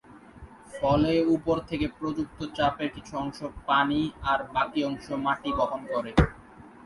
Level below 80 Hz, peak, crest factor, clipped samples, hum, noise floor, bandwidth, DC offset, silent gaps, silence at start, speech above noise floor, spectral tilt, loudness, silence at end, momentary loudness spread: -42 dBFS; -4 dBFS; 22 dB; under 0.1%; none; -48 dBFS; 11.5 kHz; under 0.1%; none; 0.1 s; 22 dB; -6.5 dB/octave; -27 LUFS; 0.15 s; 10 LU